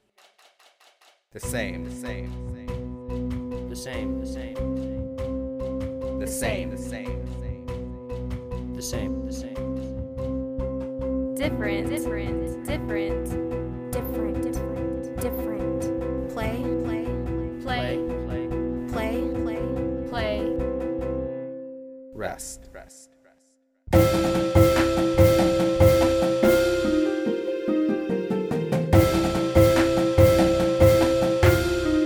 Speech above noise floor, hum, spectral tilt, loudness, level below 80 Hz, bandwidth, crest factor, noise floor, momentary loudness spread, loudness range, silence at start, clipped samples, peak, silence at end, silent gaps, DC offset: 37 dB; none; -6.5 dB/octave; -25 LUFS; -36 dBFS; over 20 kHz; 20 dB; -65 dBFS; 15 LU; 12 LU; 1.35 s; under 0.1%; -4 dBFS; 0 s; none; under 0.1%